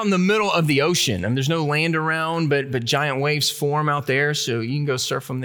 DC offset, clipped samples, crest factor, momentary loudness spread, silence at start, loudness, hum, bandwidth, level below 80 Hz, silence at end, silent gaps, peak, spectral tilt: under 0.1%; under 0.1%; 14 dB; 5 LU; 0 s; -20 LUFS; none; over 20 kHz; -62 dBFS; 0 s; none; -6 dBFS; -4.5 dB/octave